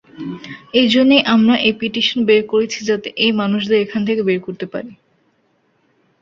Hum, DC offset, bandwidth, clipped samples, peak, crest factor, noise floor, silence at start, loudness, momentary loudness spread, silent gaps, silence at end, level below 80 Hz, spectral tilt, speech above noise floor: none; under 0.1%; 7.6 kHz; under 0.1%; -2 dBFS; 16 dB; -61 dBFS; 0.15 s; -15 LUFS; 17 LU; none; 1.25 s; -58 dBFS; -5 dB/octave; 45 dB